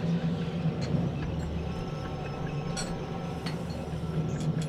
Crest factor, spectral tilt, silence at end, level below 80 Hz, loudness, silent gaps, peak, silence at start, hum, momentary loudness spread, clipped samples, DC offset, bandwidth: 14 dB; -6.5 dB/octave; 0 s; -44 dBFS; -33 LUFS; none; -16 dBFS; 0 s; none; 5 LU; under 0.1%; under 0.1%; 11.5 kHz